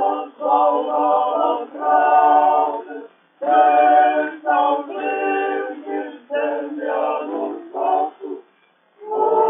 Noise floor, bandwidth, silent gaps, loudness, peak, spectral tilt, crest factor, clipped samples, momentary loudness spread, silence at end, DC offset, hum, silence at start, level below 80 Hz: -58 dBFS; 3.7 kHz; none; -18 LUFS; -2 dBFS; -0.5 dB/octave; 16 dB; under 0.1%; 14 LU; 0 s; under 0.1%; none; 0 s; under -90 dBFS